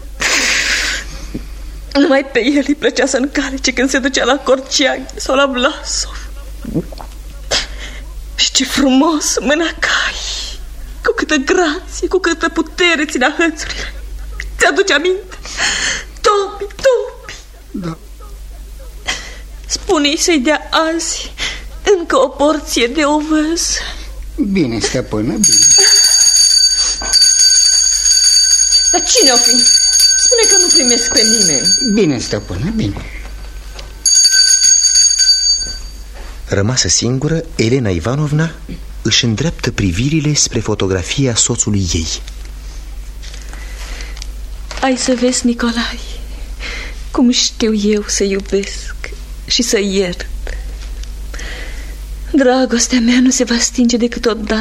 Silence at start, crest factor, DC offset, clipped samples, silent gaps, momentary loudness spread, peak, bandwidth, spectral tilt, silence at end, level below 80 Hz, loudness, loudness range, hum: 0 s; 14 dB; under 0.1%; under 0.1%; none; 23 LU; 0 dBFS; 16 kHz; -2 dB/octave; 0 s; -30 dBFS; -11 LUFS; 11 LU; none